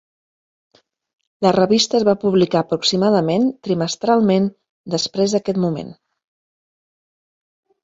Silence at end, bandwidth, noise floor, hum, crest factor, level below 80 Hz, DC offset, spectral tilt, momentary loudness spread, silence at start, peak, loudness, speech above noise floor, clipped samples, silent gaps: 1.9 s; 8 kHz; under -90 dBFS; none; 18 dB; -58 dBFS; under 0.1%; -5.5 dB/octave; 8 LU; 1.4 s; -2 dBFS; -18 LUFS; over 73 dB; under 0.1%; 4.70-4.84 s